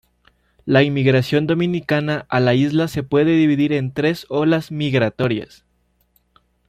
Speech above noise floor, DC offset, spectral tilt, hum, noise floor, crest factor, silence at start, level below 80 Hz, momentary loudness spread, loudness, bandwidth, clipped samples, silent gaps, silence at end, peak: 45 dB; under 0.1%; -7.5 dB/octave; 60 Hz at -50 dBFS; -62 dBFS; 16 dB; 0.65 s; -54 dBFS; 5 LU; -18 LUFS; 14.5 kHz; under 0.1%; none; 1.25 s; -2 dBFS